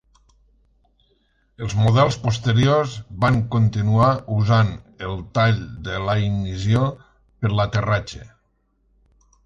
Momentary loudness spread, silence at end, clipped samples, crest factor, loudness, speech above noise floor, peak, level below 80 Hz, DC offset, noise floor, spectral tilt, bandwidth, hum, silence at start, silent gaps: 12 LU; 1.2 s; under 0.1%; 18 dB; -20 LUFS; 46 dB; -4 dBFS; -42 dBFS; under 0.1%; -66 dBFS; -7 dB/octave; 7.6 kHz; none; 1.6 s; none